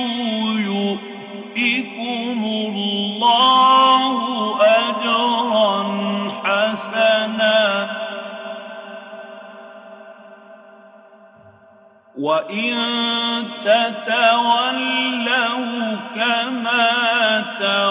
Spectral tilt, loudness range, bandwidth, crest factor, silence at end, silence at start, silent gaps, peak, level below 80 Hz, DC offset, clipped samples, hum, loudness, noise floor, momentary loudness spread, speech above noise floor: -8 dB/octave; 12 LU; 4 kHz; 16 dB; 0 s; 0 s; none; -4 dBFS; -72 dBFS; under 0.1%; under 0.1%; none; -17 LUFS; -49 dBFS; 15 LU; 31 dB